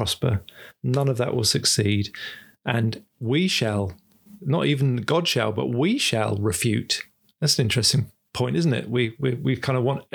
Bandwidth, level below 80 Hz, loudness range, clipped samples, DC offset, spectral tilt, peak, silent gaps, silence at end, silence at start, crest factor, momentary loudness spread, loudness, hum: over 20 kHz; -54 dBFS; 2 LU; under 0.1%; under 0.1%; -4.5 dB/octave; -4 dBFS; none; 0.1 s; 0 s; 18 dB; 11 LU; -23 LUFS; none